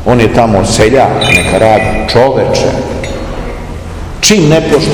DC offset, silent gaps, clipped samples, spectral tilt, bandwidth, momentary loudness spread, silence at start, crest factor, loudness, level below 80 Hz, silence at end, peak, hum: 0.7%; none; 4%; -4.5 dB/octave; over 20 kHz; 15 LU; 0 s; 8 dB; -8 LUFS; -24 dBFS; 0 s; 0 dBFS; none